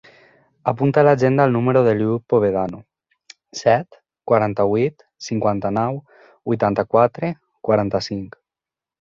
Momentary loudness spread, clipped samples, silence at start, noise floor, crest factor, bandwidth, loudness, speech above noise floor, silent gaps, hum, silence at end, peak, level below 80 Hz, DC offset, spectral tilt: 16 LU; under 0.1%; 0.65 s; -89 dBFS; 18 dB; 7.6 kHz; -19 LUFS; 71 dB; none; none; 0.8 s; -2 dBFS; -54 dBFS; under 0.1%; -7 dB/octave